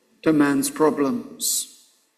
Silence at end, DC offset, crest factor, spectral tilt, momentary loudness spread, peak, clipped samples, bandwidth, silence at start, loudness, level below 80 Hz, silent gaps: 0.5 s; under 0.1%; 18 dB; -3.5 dB/octave; 6 LU; -4 dBFS; under 0.1%; 16 kHz; 0.25 s; -21 LUFS; -64 dBFS; none